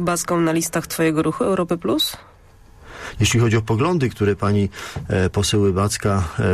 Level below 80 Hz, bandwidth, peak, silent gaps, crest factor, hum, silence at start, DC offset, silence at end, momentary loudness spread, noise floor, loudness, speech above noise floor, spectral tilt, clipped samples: -42 dBFS; 14 kHz; -6 dBFS; none; 12 dB; none; 0 s; under 0.1%; 0 s; 5 LU; -47 dBFS; -20 LUFS; 28 dB; -5 dB/octave; under 0.1%